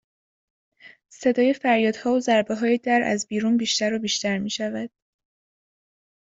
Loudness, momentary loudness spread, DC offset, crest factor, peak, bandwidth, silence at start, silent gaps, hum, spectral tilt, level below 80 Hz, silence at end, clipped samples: -22 LUFS; 7 LU; under 0.1%; 18 dB; -6 dBFS; 8 kHz; 0.85 s; none; none; -3.5 dB/octave; -68 dBFS; 1.35 s; under 0.1%